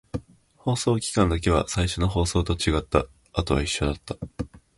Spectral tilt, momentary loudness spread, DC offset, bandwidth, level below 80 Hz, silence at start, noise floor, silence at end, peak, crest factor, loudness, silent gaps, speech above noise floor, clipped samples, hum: -5 dB/octave; 13 LU; under 0.1%; 11.5 kHz; -34 dBFS; 0.15 s; -46 dBFS; 0.2 s; -6 dBFS; 20 dB; -25 LUFS; none; 23 dB; under 0.1%; none